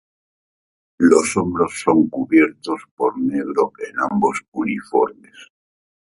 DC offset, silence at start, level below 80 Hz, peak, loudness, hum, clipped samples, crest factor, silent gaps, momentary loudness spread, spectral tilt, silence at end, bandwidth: under 0.1%; 1 s; -56 dBFS; 0 dBFS; -19 LUFS; none; under 0.1%; 20 dB; 2.91-2.97 s, 4.48-4.52 s; 9 LU; -5.5 dB/octave; 0.6 s; 11.5 kHz